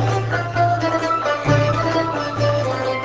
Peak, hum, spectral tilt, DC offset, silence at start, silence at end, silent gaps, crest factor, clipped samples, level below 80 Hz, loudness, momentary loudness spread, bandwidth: -4 dBFS; none; -6 dB/octave; under 0.1%; 0 s; 0 s; none; 16 dB; under 0.1%; -42 dBFS; -19 LUFS; 4 LU; 8 kHz